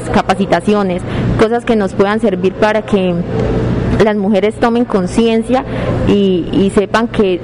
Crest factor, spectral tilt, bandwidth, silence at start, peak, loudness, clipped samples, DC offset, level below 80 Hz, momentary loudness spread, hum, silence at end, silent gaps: 10 dB; -7 dB/octave; 11 kHz; 0 s; -4 dBFS; -13 LUFS; under 0.1%; 0.4%; -30 dBFS; 4 LU; none; 0 s; none